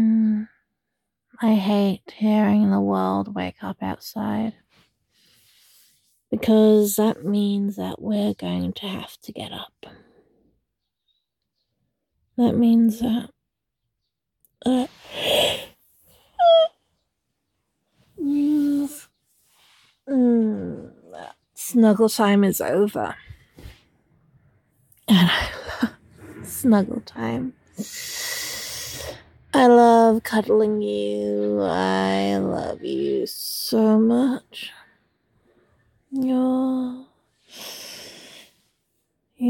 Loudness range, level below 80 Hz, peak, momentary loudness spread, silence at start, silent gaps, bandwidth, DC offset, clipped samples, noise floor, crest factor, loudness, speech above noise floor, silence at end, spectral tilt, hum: 9 LU; -56 dBFS; -4 dBFS; 19 LU; 0 s; none; 17.5 kHz; under 0.1%; under 0.1%; -81 dBFS; 18 dB; -21 LUFS; 60 dB; 0 s; -5.5 dB/octave; none